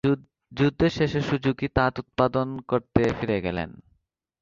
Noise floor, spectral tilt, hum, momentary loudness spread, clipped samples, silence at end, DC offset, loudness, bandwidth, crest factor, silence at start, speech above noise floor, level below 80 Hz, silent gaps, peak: -69 dBFS; -7.5 dB/octave; none; 7 LU; under 0.1%; 0.6 s; under 0.1%; -25 LUFS; 7.6 kHz; 22 dB; 0.05 s; 45 dB; -46 dBFS; none; -4 dBFS